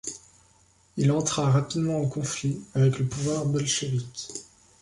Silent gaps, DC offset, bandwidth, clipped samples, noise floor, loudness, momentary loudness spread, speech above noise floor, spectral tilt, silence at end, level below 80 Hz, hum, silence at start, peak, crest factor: none; under 0.1%; 11.5 kHz; under 0.1%; -61 dBFS; -26 LUFS; 14 LU; 35 dB; -5 dB/octave; 0.4 s; -56 dBFS; none; 0.05 s; -10 dBFS; 16 dB